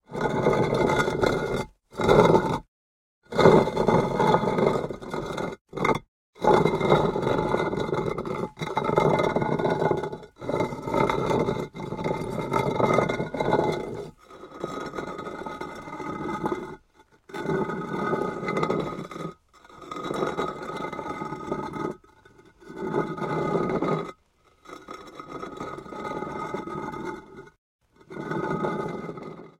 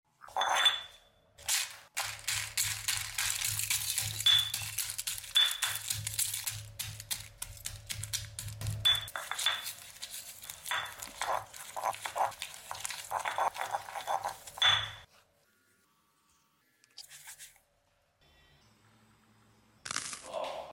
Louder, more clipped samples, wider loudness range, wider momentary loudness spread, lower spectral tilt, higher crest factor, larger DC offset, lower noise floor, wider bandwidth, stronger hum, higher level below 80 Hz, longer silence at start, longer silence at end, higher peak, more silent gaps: first, -26 LUFS vs -32 LUFS; neither; first, 11 LU vs 8 LU; about the same, 16 LU vs 16 LU; first, -6.5 dB/octave vs 0 dB/octave; about the same, 26 dB vs 22 dB; neither; second, -62 dBFS vs -73 dBFS; about the same, 16 kHz vs 17 kHz; neither; first, -50 dBFS vs -60 dBFS; about the same, 0.1 s vs 0.2 s; about the same, 0.1 s vs 0 s; first, 0 dBFS vs -14 dBFS; first, 2.68-3.22 s, 5.61-5.65 s, 6.08-6.33 s, 27.58-27.79 s vs none